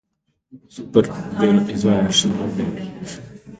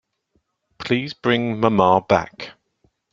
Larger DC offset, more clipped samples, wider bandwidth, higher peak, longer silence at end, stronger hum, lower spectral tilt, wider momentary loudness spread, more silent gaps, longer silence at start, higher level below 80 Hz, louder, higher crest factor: neither; neither; first, 9.4 kHz vs 7.4 kHz; about the same, 0 dBFS vs -2 dBFS; second, 0.05 s vs 0.6 s; neither; second, -5 dB/octave vs -6.5 dB/octave; about the same, 17 LU vs 19 LU; neither; second, 0.55 s vs 0.8 s; about the same, -50 dBFS vs -54 dBFS; about the same, -19 LUFS vs -19 LUFS; about the same, 20 dB vs 20 dB